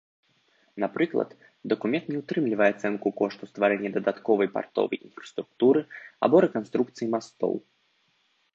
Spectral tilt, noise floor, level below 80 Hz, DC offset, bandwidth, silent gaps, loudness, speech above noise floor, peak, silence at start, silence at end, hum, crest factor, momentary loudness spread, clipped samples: -7 dB/octave; -69 dBFS; -76 dBFS; under 0.1%; 7.8 kHz; none; -26 LUFS; 43 dB; -6 dBFS; 0.75 s; 0.95 s; none; 22 dB; 13 LU; under 0.1%